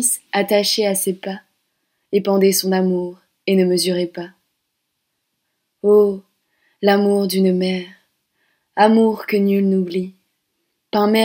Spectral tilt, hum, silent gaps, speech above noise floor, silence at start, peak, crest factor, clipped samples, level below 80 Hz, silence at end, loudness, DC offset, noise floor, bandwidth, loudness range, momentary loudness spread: -4.5 dB/octave; none; none; 57 dB; 0 s; 0 dBFS; 18 dB; under 0.1%; -70 dBFS; 0 s; -17 LUFS; under 0.1%; -74 dBFS; 16.5 kHz; 3 LU; 15 LU